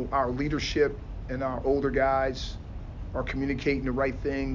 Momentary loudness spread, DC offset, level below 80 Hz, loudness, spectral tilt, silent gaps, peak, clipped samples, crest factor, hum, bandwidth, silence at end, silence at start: 13 LU; under 0.1%; -38 dBFS; -28 LUFS; -6 dB/octave; none; -12 dBFS; under 0.1%; 16 dB; none; 7.6 kHz; 0 s; 0 s